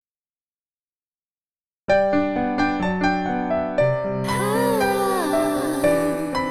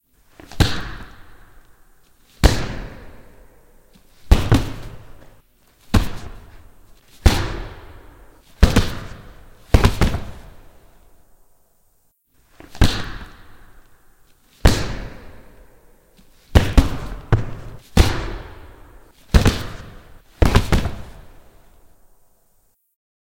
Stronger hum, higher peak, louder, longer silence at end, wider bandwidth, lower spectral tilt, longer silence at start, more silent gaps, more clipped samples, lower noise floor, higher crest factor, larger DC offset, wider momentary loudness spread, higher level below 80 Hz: neither; second, -6 dBFS vs 0 dBFS; about the same, -21 LUFS vs -20 LUFS; second, 0 s vs 2 s; about the same, 16 kHz vs 17 kHz; about the same, -5.5 dB/octave vs -5.5 dB/octave; first, 1.9 s vs 0.55 s; neither; neither; first, under -90 dBFS vs -60 dBFS; second, 16 dB vs 22 dB; first, 0.4% vs under 0.1%; second, 4 LU vs 24 LU; second, -50 dBFS vs -26 dBFS